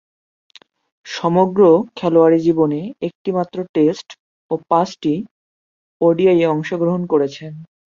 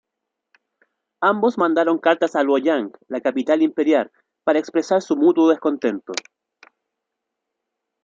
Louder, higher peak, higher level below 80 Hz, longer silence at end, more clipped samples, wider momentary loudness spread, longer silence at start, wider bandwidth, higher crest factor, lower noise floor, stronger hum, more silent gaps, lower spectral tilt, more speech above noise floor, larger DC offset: about the same, -17 LUFS vs -19 LUFS; about the same, -2 dBFS vs -2 dBFS; first, -62 dBFS vs -74 dBFS; second, 0.3 s vs 1.85 s; neither; first, 13 LU vs 9 LU; second, 1.05 s vs 1.2 s; about the same, 7.4 kHz vs 7.6 kHz; about the same, 16 dB vs 18 dB; first, under -90 dBFS vs -81 dBFS; neither; first, 3.15-3.25 s, 3.69-3.74 s, 4.19-4.49 s, 5.31-6.00 s vs none; first, -7.5 dB/octave vs -5 dB/octave; first, over 74 dB vs 63 dB; neither